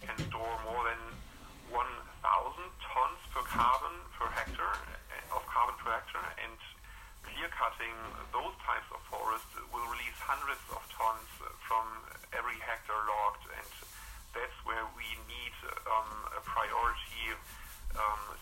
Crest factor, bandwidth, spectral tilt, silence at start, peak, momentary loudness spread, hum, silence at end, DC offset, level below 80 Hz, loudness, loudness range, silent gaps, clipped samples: 22 dB; 16 kHz; -3 dB/octave; 0 s; -16 dBFS; 13 LU; none; 0 s; under 0.1%; -52 dBFS; -37 LUFS; 4 LU; none; under 0.1%